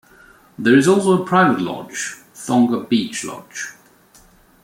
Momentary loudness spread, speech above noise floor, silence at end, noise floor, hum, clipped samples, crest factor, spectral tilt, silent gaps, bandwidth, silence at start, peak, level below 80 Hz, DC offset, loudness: 16 LU; 34 dB; 0.9 s; -50 dBFS; none; under 0.1%; 18 dB; -5 dB/octave; none; 16.5 kHz; 0.6 s; -2 dBFS; -60 dBFS; under 0.1%; -17 LUFS